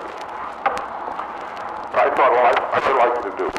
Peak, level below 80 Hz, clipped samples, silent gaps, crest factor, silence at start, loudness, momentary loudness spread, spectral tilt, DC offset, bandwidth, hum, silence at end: -6 dBFS; -54 dBFS; under 0.1%; none; 16 dB; 0 s; -20 LUFS; 15 LU; -4 dB/octave; under 0.1%; 12 kHz; none; 0 s